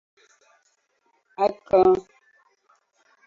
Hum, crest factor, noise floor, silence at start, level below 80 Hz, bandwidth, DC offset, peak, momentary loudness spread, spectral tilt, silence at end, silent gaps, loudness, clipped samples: none; 20 dB; -69 dBFS; 1.4 s; -58 dBFS; 7.2 kHz; under 0.1%; -6 dBFS; 9 LU; -7.5 dB/octave; 1.25 s; none; -21 LUFS; under 0.1%